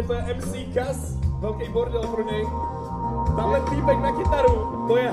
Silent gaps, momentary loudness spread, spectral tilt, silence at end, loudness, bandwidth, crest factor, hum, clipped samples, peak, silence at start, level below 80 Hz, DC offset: none; 8 LU; -7 dB/octave; 0 s; -24 LUFS; 13.5 kHz; 16 dB; none; under 0.1%; -6 dBFS; 0 s; -32 dBFS; under 0.1%